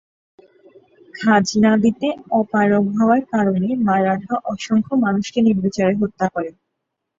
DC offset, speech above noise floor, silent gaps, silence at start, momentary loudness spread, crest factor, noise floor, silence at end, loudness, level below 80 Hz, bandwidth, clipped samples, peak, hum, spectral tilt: under 0.1%; 60 dB; none; 1.15 s; 7 LU; 16 dB; -77 dBFS; 0.7 s; -18 LUFS; -56 dBFS; 7.8 kHz; under 0.1%; -2 dBFS; none; -6.5 dB/octave